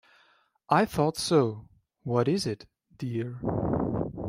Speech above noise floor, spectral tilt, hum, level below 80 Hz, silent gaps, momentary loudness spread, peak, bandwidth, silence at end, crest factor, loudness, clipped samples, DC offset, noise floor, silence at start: 38 dB; -6 dB/octave; none; -52 dBFS; none; 13 LU; -8 dBFS; 16 kHz; 0 s; 20 dB; -28 LUFS; under 0.1%; under 0.1%; -65 dBFS; 0.7 s